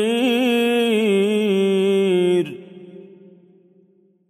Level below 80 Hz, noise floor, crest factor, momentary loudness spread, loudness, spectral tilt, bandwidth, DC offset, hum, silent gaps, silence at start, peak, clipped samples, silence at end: -76 dBFS; -57 dBFS; 12 dB; 3 LU; -18 LUFS; -5.5 dB/octave; 15 kHz; under 0.1%; none; none; 0 s; -8 dBFS; under 0.1%; 1.25 s